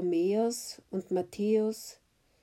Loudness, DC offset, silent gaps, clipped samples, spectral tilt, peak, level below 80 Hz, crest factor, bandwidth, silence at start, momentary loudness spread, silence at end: -31 LUFS; under 0.1%; none; under 0.1%; -5.5 dB/octave; -18 dBFS; -72 dBFS; 14 dB; 16 kHz; 0 s; 11 LU; 0.5 s